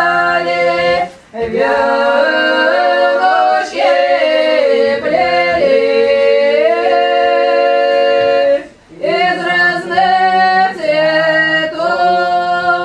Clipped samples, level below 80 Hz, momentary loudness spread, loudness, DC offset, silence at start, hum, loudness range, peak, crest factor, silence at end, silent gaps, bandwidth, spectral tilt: under 0.1%; -50 dBFS; 3 LU; -12 LUFS; under 0.1%; 0 s; none; 1 LU; 0 dBFS; 12 dB; 0 s; none; 10 kHz; -4.5 dB/octave